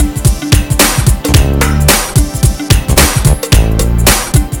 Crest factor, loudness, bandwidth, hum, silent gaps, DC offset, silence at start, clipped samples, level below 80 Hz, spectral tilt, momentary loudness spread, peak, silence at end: 10 dB; -10 LUFS; over 20 kHz; none; none; under 0.1%; 0 s; 0.8%; -14 dBFS; -4 dB/octave; 5 LU; 0 dBFS; 0 s